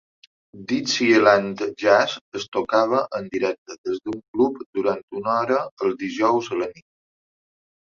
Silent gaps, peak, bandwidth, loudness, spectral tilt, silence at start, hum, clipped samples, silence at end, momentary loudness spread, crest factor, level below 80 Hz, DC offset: 2.21-2.32 s, 2.48-2.52 s, 3.58-3.66 s, 3.78-3.84 s, 4.28-4.34 s, 4.66-4.73 s, 5.03-5.08 s, 5.71-5.77 s; -2 dBFS; 7.4 kHz; -22 LUFS; -4 dB/octave; 0.55 s; none; under 0.1%; 1.1 s; 12 LU; 20 dB; -66 dBFS; under 0.1%